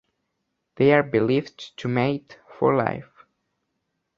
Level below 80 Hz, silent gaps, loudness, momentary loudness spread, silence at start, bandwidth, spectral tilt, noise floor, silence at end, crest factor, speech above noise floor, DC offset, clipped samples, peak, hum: -60 dBFS; none; -22 LUFS; 14 LU; 0.8 s; 7.2 kHz; -8 dB/octave; -77 dBFS; 1.15 s; 22 dB; 56 dB; under 0.1%; under 0.1%; -4 dBFS; none